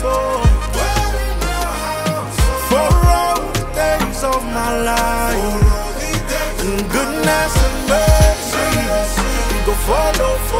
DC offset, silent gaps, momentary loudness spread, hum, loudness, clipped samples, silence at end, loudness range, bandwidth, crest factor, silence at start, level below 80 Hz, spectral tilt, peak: under 0.1%; none; 7 LU; none; -17 LUFS; under 0.1%; 0 s; 2 LU; 16.5 kHz; 14 dB; 0 s; -20 dBFS; -4.5 dB/octave; -2 dBFS